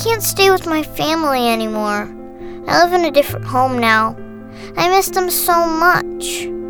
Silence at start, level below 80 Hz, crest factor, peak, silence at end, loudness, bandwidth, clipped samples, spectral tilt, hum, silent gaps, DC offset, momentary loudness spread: 0 s; -40 dBFS; 16 dB; 0 dBFS; 0 s; -15 LUFS; over 20 kHz; under 0.1%; -3.5 dB/octave; none; none; under 0.1%; 16 LU